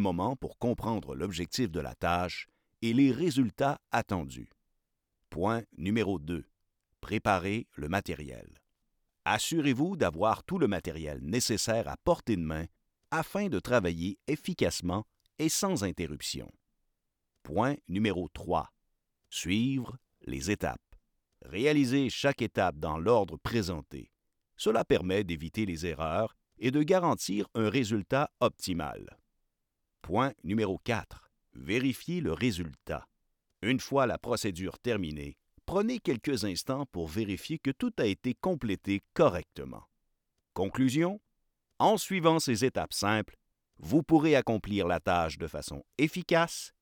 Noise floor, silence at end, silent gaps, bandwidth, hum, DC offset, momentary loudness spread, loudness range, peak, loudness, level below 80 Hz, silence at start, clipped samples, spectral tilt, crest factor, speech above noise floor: -82 dBFS; 0.15 s; none; over 20 kHz; none; under 0.1%; 13 LU; 5 LU; -8 dBFS; -31 LUFS; -56 dBFS; 0 s; under 0.1%; -5 dB/octave; 22 dB; 52 dB